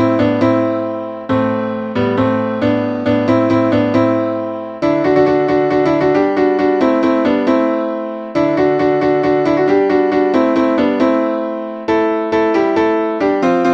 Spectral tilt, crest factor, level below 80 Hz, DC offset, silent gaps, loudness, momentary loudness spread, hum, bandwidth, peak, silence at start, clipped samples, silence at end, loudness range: -8 dB/octave; 12 dB; -48 dBFS; under 0.1%; none; -15 LUFS; 6 LU; none; 7.6 kHz; 0 dBFS; 0 s; under 0.1%; 0 s; 2 LU